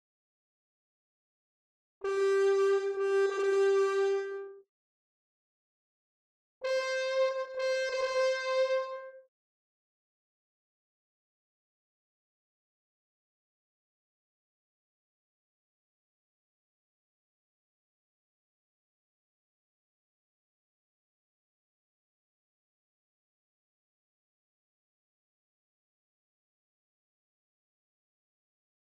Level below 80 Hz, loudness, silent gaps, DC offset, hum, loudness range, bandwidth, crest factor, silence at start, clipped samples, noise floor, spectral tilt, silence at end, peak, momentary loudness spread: -86 dBFS; -30 LUFS; 4.69-6.61 s; under 0.1%; none; 7 LU; 9.6 kHz; 18 dB; 2 s; under 0.1%; under -90 dBFS; -1.5 dB/octave; 19.75 s; -20 dBFS; 13 LU